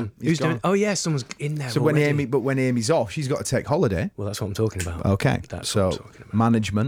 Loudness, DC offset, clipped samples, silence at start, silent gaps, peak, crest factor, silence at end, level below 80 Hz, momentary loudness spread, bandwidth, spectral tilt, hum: -23 LUFS; under 0.1%; under 0.1%; 0 s; none; -10 dBFS; 14 dB; 0 s; -50 dBFS; 7 LU; 17 kHz; -5.5 dB/octave; none